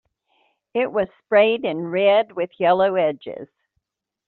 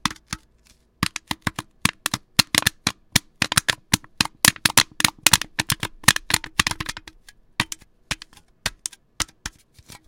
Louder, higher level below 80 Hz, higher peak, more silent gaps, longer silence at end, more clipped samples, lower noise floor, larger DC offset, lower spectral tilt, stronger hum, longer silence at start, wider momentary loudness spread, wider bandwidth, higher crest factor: about the same, -20 LUFS vs -21 LUFS; second, -68 dBFS vs -46 dBFS; second, -4 dBFS vs 0 dBFS; neither; first, 0.8 s vs 0.6 s; neither; first, -76 dBFS vs -58 dBFS; neither; first, -3 dB/octave vs -1 dB/octave; neither; first, 0.75 s vs 0.05 s; second, 12 LU vs 15 LU; second, 4.4 kHz vs 17.5 kHz; second, 18 dB vs 24 dB